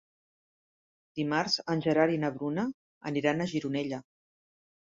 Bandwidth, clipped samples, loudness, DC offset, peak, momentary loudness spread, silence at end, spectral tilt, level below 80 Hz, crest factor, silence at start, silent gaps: 7.8 kHz; under 0.1%; -30 LUFS; under 0.1%; -10 dBFS; 11 LU; 0.85 s; -5.5 dB/octave; -70 dBFS; 22 dB; 1.15 s; 2.74-3.01 s